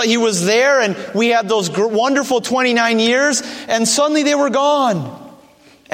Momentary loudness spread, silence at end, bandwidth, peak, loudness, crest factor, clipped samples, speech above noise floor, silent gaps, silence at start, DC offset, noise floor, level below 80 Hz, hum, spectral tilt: 5 LU; 0.6 s; 16.5 kHz; -2 dBFS; -15 LUFS; 14 dB; under 0.1%; 32 dB; none; 0 s; under 0.1%; -47 dBFS; -66 dBFS; none; -3 dB/octave